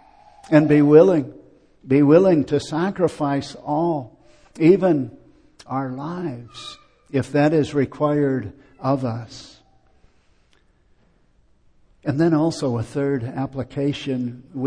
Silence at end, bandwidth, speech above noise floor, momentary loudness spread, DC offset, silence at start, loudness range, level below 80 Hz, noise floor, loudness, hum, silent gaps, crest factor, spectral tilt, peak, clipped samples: 0 s; 10 kHz; 39 dB; 17 LU; under 0.1%; 0.5 s; 11 LU; -56 dBFS; -58 dBFS; -20 LUFS; none; none; 20 dB; -7.5 dB/octave; -2 dBFS; under 0.1%